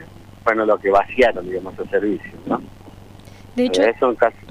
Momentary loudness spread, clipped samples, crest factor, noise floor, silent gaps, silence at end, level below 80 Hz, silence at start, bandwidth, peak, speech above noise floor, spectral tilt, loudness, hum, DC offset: 11 LU; under 0.1%; 18 dB; -41 dBFS; none; 0 s; -46 dBFS; 0 s; 12.5 kHz; -2 dBFS; 22 dB; -5 dB/octave; -19 LUFS; none; under 0.1%